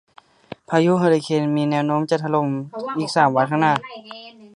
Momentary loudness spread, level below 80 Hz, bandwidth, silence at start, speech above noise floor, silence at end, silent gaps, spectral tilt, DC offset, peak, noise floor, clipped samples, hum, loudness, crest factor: 19 LU; -66 dBFS; 11 kHz; 0.7 s; 22 dB; 0.1 s; none; -6.5 dB/octave; under 0.1%; -2 dBFS; -41 dBFS; under 0.1%; none; -20 LUFS; 18 dB